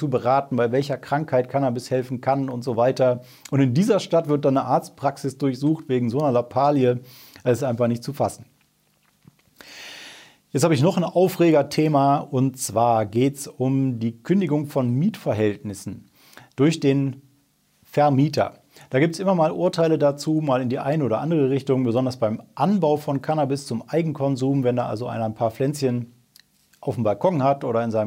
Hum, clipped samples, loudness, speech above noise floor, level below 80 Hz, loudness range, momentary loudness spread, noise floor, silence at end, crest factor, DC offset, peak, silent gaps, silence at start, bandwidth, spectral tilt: none; under 0.1%; -22 LUFS; 43 dB; -68 dBFS; 4 LU; 9 LU; -64 dBFS; 0 s; 16 dB; under 0.1%; -6 dBFS; none; 0 s; 16 kHz; -7 dB/octave